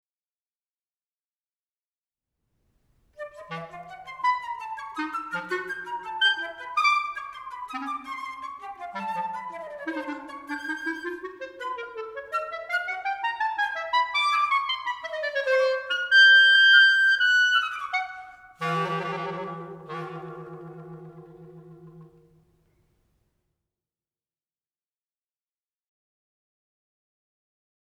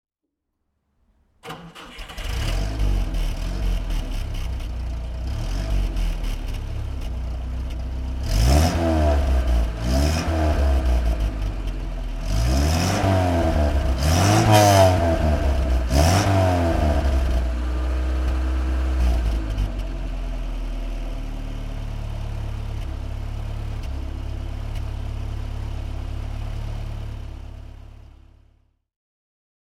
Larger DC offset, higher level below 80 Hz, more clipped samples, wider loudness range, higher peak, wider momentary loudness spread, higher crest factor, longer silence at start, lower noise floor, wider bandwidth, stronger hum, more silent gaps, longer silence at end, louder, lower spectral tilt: neither; second, -72 dBFS vs -24 dBFS; neither; first, 17 LU vs 13 LU; second, -6 dBFS vs -2 dBFS; first, 21 LU vs 14 LU; about the same, 22 dB vs 20 dB; first, 3.2 s vs 1.45 s; first, under -90 dBFS vs -79 dBFS; second, 13 kHz vs 16 kHz; neither; neither; first, 5.85 s vs 1.8 s; about the same, -23 LUFS vs -24 LUFS; second, -2.5 dB/octave vs -5.5 dB/octave